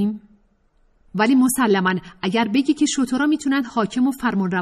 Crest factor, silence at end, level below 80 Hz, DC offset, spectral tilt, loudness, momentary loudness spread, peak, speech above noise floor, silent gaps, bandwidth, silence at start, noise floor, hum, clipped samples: 14 dB; 0 s; -56 dBFS; under 0.1%; -4.5 dB/octave; -20 LUFS; 7 LU; -6 dBFS; 40 dB; none; 14 kHz; 0 s; -60 dBFS; none; under 0.1%